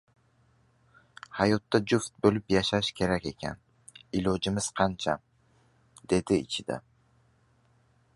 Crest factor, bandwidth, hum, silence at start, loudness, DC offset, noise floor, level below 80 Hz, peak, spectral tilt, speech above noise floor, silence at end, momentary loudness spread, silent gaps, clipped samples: 24 dB; 11.5 kHz; none; 1.3 s; -29 LUFS; under 0.1%; -66 dBFS; -54 dBFS; -8 dBFS; -5 dB/octave; 38 dB; 1.35 s; 13 LU; none; under 0.1%